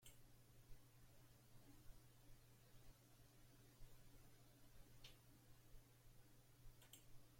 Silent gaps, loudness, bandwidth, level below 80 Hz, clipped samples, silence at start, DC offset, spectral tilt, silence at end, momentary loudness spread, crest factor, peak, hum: none; -68 LUFS; 16.5 kHz; -70 dBFS; under 0.1%; 0 s; under 0.1%; -4 dB/octave; 0 s; 4 LU; 18 dB; -46 dBFS; none